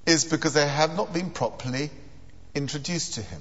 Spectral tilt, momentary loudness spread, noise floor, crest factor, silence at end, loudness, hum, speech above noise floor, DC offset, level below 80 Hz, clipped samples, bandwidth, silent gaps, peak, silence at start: -3.5 dB/octave; 10 LU; -49 dBFS; 22 dB; 0 s; -26 LUFS; none; 22 dB; 0.7%; -54 dBFS; under 0.1%; 8.2 kHz; none; -6 dBFS; 0.05 s